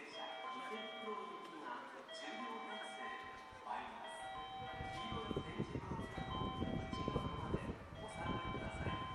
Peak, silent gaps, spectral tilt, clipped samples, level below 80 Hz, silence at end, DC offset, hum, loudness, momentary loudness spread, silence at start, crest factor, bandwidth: -24 dBFS; none; -5.5 dB/octave; under 0.1%; -58 dBFS; 0 s; under 0.1%; none; -46 LUFS; 7 LU; 0 s; 20 dB; 13.5 kHz